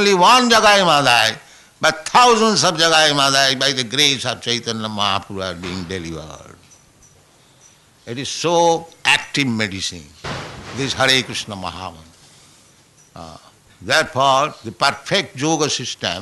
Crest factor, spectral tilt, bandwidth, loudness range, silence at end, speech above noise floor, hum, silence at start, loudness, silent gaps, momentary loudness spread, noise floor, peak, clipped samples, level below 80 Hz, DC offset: 16 dB; -2.5 dB/octave; 12.5 kHz; 11 LU; 0 s; 34 dB; none; 0 s; -16 LUFS; none; 17 LU; -51 dBFS; -2 dBFS; under 0.1%; -52 dBFS; under 0.1%